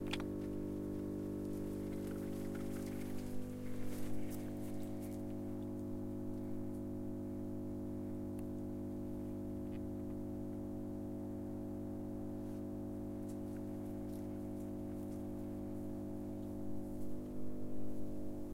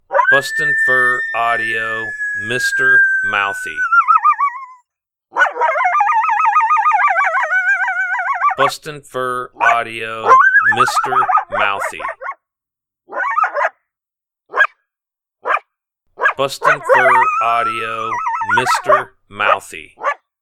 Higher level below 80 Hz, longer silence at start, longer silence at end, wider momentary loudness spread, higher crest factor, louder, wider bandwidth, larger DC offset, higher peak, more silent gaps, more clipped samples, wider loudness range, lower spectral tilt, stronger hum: about the same, -58 dBFS vs -58 dBFS; about the same, 0 s vs 0.1 s; second, 0 s vs 0.25 s; second, 3 LU vs 11 LU; about the same, 18 dB vs 16 dB; second, -45 LUFS vs -14 LUFS; about the same, 16 kHz vs 16 kHz; neither; second, -24 dBFS vs 0 dBFS; neither; neither; second, 1 LU vs 6 LU; first, -7.5 dB/octave vs -2.5 dB/octave; first, 50 Hz at -50 dBFS vs none